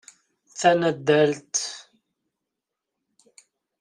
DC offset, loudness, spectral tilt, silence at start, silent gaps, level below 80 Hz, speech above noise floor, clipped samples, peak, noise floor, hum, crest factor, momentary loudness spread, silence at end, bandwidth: under 0.1%; -22 LUFS; -4 dB/octave; 0.55 s; none; -70 dBFS; 64 dB; under 0.1%; -6 dBFS; -84 dBFS; none; 22 dB; 17 LU; 2 s; 11 kHz